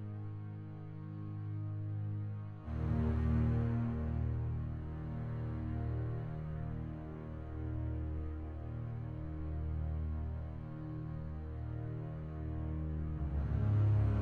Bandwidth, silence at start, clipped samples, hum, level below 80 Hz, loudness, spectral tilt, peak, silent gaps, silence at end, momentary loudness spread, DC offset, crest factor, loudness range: 4.3 kHz; 0 s; under 0.1%; none; -44 dBFS; -39 LUFS; -11 dB/octave; -22 dBFS; none; 0 s; 11 LU; under 0.1%; 16 dB; 5 LU